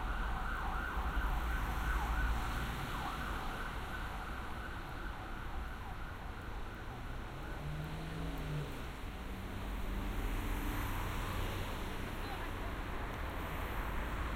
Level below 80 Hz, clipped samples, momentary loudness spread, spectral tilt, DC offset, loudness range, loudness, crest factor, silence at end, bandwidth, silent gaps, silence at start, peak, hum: -42 dBFS; under 0.1%; 8 LU; -5.5 dB/octave; under 0.1%; 6 LU; -42 LUFS; 16 dB; 0 s; 16 kHz; none; 0 s; -24 dBFS; none